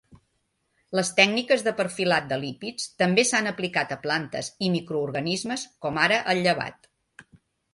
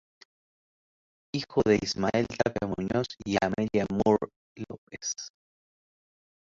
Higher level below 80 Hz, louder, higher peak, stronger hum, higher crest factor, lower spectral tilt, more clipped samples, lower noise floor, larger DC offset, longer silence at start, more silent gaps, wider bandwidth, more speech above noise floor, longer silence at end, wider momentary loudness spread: second, -66 dBFS vs -54 dBFS; first, -24 LUFS vs -28 LUFS; first, -4 dBFS vs -8 dBFS; neither; about the same, 22 dB vs 22 dB; second, -3.5 dB/octave vs -5 dB/octave; neither; second, -74 dBFS vs under -90 dBFS; neither; second, 0.9 s vs 1.35 s; second, none vs 4.36-4.56 s, 4.78-4.87 s; first, 11.5 kHz vs 7.6 kHz; second, 49 dB vs over 62 dB; second, 0.5 s vs 1.2 s; second, 11 LU vs 16 LU